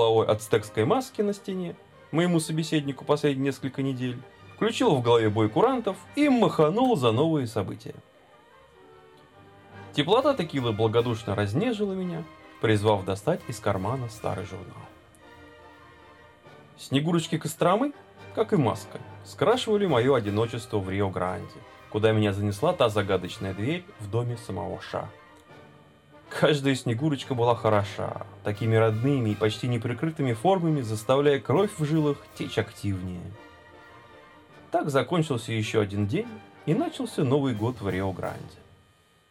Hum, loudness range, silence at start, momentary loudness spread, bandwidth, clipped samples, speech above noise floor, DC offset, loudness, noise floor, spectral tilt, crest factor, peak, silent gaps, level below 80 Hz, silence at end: none; 6 LU; 0 s; 13 LU; 15.5 kHz; under 0.1%; 35 dB; under 0.1%; -26 LUFS; -61 dBFS; -6.5 dB/octave; 20 dB; -6 dBFS; none; -62 dBFS; 0.75 s